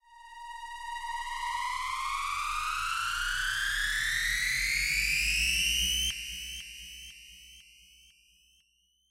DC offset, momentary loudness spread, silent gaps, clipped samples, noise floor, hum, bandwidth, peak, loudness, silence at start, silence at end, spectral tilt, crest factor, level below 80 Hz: under 0.1%; 19 LU; none; under 0.1%; -71 dBFS; none; 16 kHz; -16 dBFS; -29 LUFS; 0.1 s; 1.5 s; 1.5 dB/octave; 18 dB; -46 dBFS